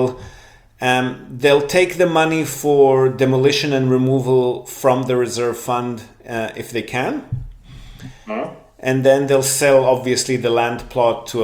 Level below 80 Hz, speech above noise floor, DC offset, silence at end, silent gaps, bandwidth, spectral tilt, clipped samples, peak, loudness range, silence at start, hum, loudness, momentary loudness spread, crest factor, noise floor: -46 dBFS; 28 dB; under 0.1%; 0 s; none; 20 kHz; -5 dB/octave; under 0.1%; -2 dBFS; 8 LU; 0 s; none; -17 LUFS; 13 LU; 16 dB; -45 dBFS